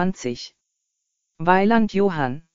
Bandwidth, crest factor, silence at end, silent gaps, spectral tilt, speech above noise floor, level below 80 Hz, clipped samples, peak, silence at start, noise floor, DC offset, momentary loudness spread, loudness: 7.4 kHz; 20 dB; 0 s; none; -5 dB/octave; 57 dB; -52 dBFS; under 0.1%; -2 dBFS; 0 s; -78 dBFS; under 0.1%; 15 LU; -20 LUFS